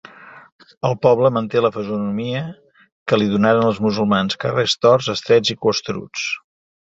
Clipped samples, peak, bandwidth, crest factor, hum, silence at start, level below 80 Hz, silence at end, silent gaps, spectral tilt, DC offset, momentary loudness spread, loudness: under 0.1%; -2 dBFS; 7.8 kHz; 18 dB; none; 0.2 s; -54 dBFS; 0.45 s; 0.52-0.59 s, 0.77-0.81 s, 2.92-3.06 s; -5.5 dB/octave; under 0.1%; 10 LU; -18 LUFS